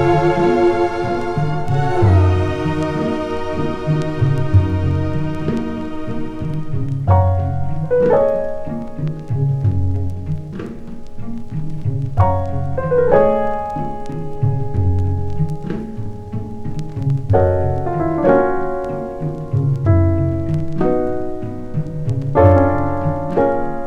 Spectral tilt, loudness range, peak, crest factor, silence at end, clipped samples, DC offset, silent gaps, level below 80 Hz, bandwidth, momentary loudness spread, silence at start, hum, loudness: -9 dB/octave; 5 LU; 0 dBFS; 16 dB; 0 s; under 0.1%; under 0.1%; none; -32 dBFS; 7.6 kHz; 12 LU; 0 s; none; -18 LUFS